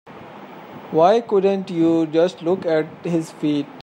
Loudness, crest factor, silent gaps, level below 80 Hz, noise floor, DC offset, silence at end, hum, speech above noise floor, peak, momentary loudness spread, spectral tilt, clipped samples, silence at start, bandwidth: -19 LUFS; 16 dB; none; -70 dBFS; -39 dBFS; under 0.1%; 0 s; none; 20 dB; -4 dBFS; 23 LU; -7 dB/octave; under 0.1%; 0.05 s; 11 kHz